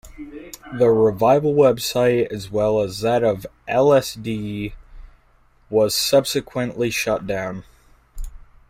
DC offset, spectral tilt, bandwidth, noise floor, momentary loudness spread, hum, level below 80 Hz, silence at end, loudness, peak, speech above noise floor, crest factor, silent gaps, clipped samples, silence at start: under 0.1%; -5 dB/octave; 16 kHz; -56 dBFS; 20 LU; none; -42 dBFS; 0.25 s; -19 LUFS; -4 dBFS; 36 dB; 16 dB; none; under 0.1%; 0.05 s